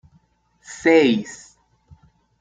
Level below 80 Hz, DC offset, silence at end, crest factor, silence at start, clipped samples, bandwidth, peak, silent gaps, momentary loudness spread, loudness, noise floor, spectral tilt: -60 dBFS; under 0.1%; 1.05 s; 20 dB; 0.7 s; under 0.1%; 9.2 kHz; -2 dBFS; none; 24 LU; -17 LUFS; -60 dBFS; -4.5 dB/octave